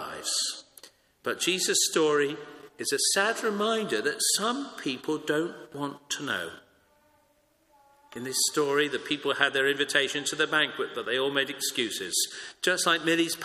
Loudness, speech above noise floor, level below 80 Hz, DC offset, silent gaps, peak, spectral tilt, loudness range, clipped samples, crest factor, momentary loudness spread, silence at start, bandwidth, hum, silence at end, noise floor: -27 LUFS; 39 dB; -74 dBFS; under 0.1%; none; -6 dBFS; -1.5 dB/octave; 7 LU; under 0.1%; 22 dB; 11 LU; 0 s; 15.5 kHz; none; 0 s; -67 dBFS